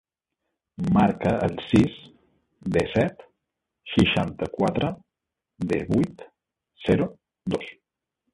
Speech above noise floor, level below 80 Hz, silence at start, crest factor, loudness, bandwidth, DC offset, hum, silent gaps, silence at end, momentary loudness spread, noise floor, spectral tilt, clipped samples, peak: 62 dB; -46 dBFS; 0.8 s; 20 dB; -24 LUFS; 11.5 kHz; under 0.1%; none; none; 0.6 s; 14 LU; -85 dBFS; -7 dB/octave; under 0.1%; -4 dBFS